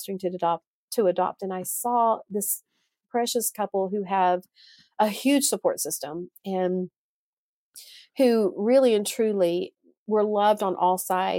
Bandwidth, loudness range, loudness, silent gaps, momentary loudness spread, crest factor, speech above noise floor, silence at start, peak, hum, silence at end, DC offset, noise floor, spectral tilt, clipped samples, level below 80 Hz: 17 kHz; 4 LU; -25 LUFS; 0.67-0.88 s, 6.98-7.73 s, 9.97-10.06 s; 10 LU; 16 dB; over 66 dB; 0 s; -8 dBFS; none; 0 s; under 0.1%; under -90 dBFS; -4 dB/octave; under 0.1%; -78 dBFS